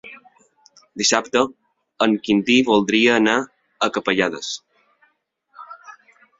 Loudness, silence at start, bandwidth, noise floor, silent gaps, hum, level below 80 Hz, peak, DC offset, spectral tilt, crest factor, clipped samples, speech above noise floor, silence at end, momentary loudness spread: -18 LUFS; 0.05 s; 7.8 kHz; -66 dBFS; none; none; -60 dBFS; 0 dBFS; under 0.1%; -3 dB/octave; 20 dB; under 0.1%; 48 dB; 0.5 s; 23 LU